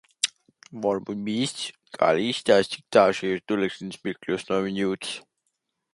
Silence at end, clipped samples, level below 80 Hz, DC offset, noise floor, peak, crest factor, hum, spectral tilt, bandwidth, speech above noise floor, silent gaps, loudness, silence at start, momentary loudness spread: 0.75 s; under 0.1%; -64 dBFS; under 0.1%; -78 dBFS; -4 dBFS; 22 dB; none; -4 dB/octave; 11.5 kHz; 53 dB; none; -25 LUFS; 0.25 s; 13 LU